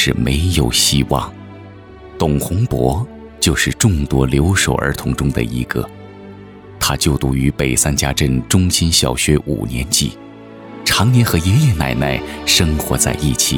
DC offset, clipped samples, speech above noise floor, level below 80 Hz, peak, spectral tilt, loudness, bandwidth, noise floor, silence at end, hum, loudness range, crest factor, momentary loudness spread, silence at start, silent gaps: under 0.1%; under 0.1%; 21 dB; -28 dBFS; 0 dBFS; -4 dB/octave; -15 LUFS; 19.5 kHz; -36 dBFS; 0 s; none; 3 LU; 16 dB; 10 LU; 0 s; none